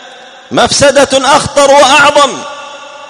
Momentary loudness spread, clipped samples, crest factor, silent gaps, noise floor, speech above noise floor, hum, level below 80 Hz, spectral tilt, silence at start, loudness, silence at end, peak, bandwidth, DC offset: 19 LU; 2%; 8 dB; none; -32 dBFS; 26 dB; none; -40 dBFS; -2 dB/octave; 0.05 s; -6 LUFS; 0 s; 0 dBFS; 14 kHz; under 0.1%